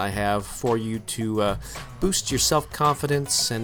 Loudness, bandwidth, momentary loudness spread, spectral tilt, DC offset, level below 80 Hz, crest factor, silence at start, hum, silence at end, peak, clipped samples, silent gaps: -24 LUFS; over 20 kHz; 7 LU; -3.5 dB/octave; under 0.1%; -42 dBFS; 16 dB; 0 s; none; 0 s; -8 dBFS; under 0.1%; none